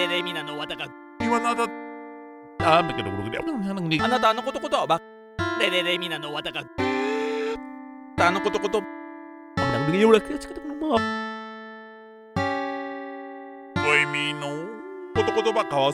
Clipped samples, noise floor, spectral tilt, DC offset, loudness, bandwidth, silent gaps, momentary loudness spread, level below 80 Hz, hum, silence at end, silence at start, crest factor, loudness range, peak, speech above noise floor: under 0.1%; -45 dBFS; -5 dB/octave; under 0.1%; -25 LUFS; 15 kHz; none; 19 LU; -54 dBFS; none; 0 s; 0 s; 22 dB; 3 LU; -4 dBFS; 21 dB